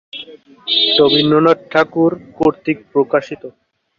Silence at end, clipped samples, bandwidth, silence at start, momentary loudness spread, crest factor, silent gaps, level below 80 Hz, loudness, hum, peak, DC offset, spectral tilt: 0.5 s; under 0.1%; 7.2 kHz; 0.15 s; 19 LU; 14 dB; none; -54 dBFS; -14 LUFS; none; -2 dBFS; under 0.1%; -6.5 dB/octave